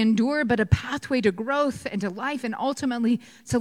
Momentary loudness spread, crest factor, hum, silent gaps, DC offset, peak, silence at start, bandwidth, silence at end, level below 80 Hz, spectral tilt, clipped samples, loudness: 6 LU; 20 dB; none; none; under 0.1%; -6 dBFS; 0 s; 12.5 kHz; 0 s; -44 dBFS; -6 dB/octave; under 0.1%; -25 LUFS